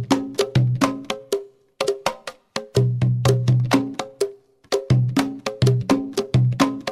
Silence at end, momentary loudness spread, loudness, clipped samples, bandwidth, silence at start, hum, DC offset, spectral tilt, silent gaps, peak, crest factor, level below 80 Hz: 0 s; 10 LU; -22 LUFS; under 0.1%; 14 kHz; 0 s; none; under 0.1%; -6.5 dB/octave; none; -2 dBFS; 18 dB; -48 dBFS